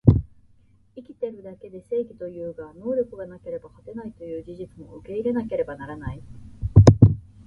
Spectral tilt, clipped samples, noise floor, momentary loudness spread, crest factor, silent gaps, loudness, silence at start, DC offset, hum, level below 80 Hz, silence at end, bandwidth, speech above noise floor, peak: -9 dB/octave; under 0.1%; -57 dBFS; 24 LU; 22 dB; none; -22 LUFS; 0.05 s; under 0.1%; none; -36 dBFS; 0.25 s; 7.4 kHz; 26 dB; 0 dBFS